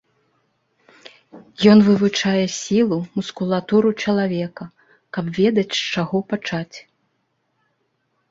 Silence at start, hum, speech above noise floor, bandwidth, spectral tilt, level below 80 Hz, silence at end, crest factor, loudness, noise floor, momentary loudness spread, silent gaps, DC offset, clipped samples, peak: 1.35 s; none; 51 dB; 7.8 kHz; -5.5 dB/octave; -58 dBFS; 1.5 s; 18 dB; -19 LUFS; -70 dBFS; 16 LU; none; under 0.1%; under 0.1%; -2 dBFS